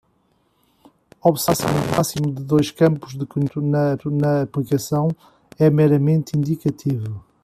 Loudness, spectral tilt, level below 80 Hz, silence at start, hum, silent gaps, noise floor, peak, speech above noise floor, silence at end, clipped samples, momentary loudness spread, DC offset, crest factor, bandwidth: -20 LUFS; -6.5 dB/octave; -52 dBFS; 1.25 s; none; none; -63 dBFS; -4 dBFS; 44 dB; 0.25 s; under 0.1%; 9 LU; under 0.1%; 16 dB; 15 kHz